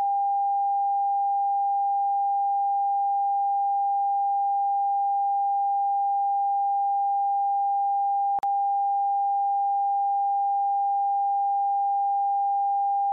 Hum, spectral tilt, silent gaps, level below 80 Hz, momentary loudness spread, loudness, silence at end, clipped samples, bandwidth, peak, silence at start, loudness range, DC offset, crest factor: none; 16 dB/octave; none; -86 dBFS; 0 LU; -24 LUFS; 0 s; under 0.1%; 1.3 kHz; -20 dBFS; 0 s; 0 LU; under 0.1%; 4 dB